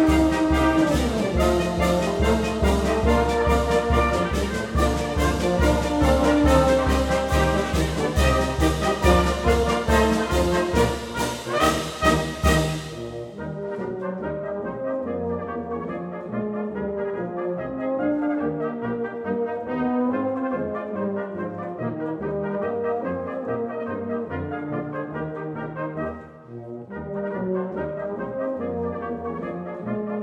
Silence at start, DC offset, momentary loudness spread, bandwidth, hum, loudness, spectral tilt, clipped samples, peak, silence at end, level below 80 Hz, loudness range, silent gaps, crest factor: 0 s; under 0.1%; 11 LU; 17.5 kHz; none; -24 LUFS; -6 dB/octave; under 0.1%; -4 dBFS; 0 s; -32 dBFS; 9 LU; none; 18 dB